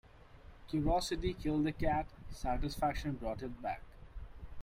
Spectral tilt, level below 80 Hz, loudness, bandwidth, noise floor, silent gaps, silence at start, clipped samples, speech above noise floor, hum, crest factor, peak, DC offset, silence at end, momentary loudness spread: -6 dB/octave; -46 dBFS; -37 LUFS; 16 kHz; -56 dBFS; none; 0.05 s; under 0.1%; 21 dB; none; 18 dB; -20 dBFS; under 0.1%; 0 s; 20 LU